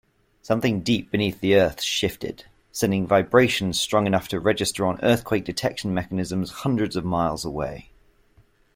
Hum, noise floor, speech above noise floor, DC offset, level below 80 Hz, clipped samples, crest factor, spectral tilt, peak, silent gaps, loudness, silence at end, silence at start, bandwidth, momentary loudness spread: none; -59 dBFS; 36 dB; under 0.1%; -50 dBFS; under 0.1%; 20 dB; -5 dB/octave; -4 dBFS; none; -23 LUFS; 0.95 s; 0.45 s; 16.5 kHz; 10 LU